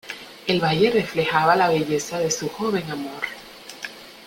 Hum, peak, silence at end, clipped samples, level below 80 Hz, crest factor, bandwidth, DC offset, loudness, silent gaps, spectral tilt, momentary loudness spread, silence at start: none; -4 dBFS; 0 s; under 0.1%; -58 dBFS; 20 dB; 16.5 kHz; under 0.1%; -22 LUFS; none; -4 dB/octave; 17 LU; 0.05 s